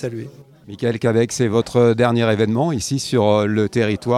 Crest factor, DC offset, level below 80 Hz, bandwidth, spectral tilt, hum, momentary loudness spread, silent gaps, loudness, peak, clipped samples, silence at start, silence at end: 16 dB; under 0.1%; -52 dBFS; 13.5 kHz; -6 dB/octave; none; 8 LU; none; -18 LUFS; -2 dBFS; under 0.1%; 0 s; 0 s